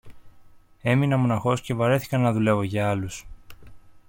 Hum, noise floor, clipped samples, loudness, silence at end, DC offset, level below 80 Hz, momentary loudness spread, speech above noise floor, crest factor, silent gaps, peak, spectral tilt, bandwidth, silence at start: none; -50 dBFS; under 0.1%; -23 LUFS; 0.1 s; under 0.1%; -52 dBFS; 9 LU; 28 dB; 16 dB; none; -8 dBFS; -7 dB/octave; 16.5 kHz; 0.05 s